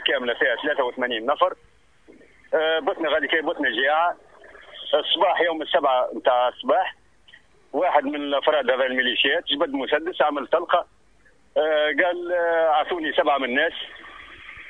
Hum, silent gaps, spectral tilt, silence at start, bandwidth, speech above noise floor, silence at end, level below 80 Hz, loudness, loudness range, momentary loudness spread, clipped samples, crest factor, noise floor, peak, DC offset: none; none; -4.5 dB/octave; 0 s; 4.2 kHz; 37 dB; 0 s; -62 dBFS; -22 LUFS; 2 LU; 9 LU; under 0.1%; 18 dB; -59 dBFS; -4 dBFS; 0.1%